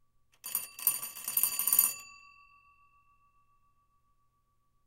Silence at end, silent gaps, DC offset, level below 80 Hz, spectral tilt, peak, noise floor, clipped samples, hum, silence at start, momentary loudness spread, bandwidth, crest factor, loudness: 2.7 s; none; under 0.1%; -74 dBFS; 2 dB/octave; -8 dBFS; -73 dBFS; under 0.1%; none; 0.45 s; 19 LU; 17 kHz; 28 dB; -29 LUFS